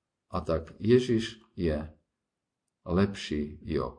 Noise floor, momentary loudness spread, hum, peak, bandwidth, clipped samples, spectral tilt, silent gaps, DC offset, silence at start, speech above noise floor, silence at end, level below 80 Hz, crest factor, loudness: -86 dBFS; 13 LU; none; -10 dBFS; 10 kHz; under 0.1%; -7 dB/octave; none; under 0.1%; 0.3 s; 57 dB; 0.05 s; -46 dBFS; 20 dB; -30 LUFS